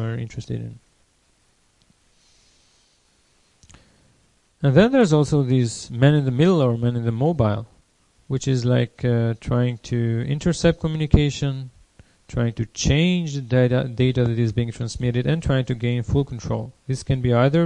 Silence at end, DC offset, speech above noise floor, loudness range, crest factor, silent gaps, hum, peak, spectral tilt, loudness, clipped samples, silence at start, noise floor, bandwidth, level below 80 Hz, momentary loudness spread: 0 s; under 0.1%; 42 dB; 4 LU; 22 dB; none; none; 0 dBFS; -7 dB/octave; -21 LUFS; under 0.1%; 0 s; -62 dBFS; 10 kHz; -38 dBFS; 11 LU